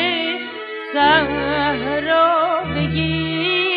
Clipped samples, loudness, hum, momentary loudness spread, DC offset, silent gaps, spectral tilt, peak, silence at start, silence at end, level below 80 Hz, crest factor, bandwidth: under 0.1%; -18 LUFS; none; 9 LU; under 0.1%; none; -8.5 dB/octave; -2 dBFS; 0 s; 0 s; -42 dBFS; 16 dB; 5.2 kHz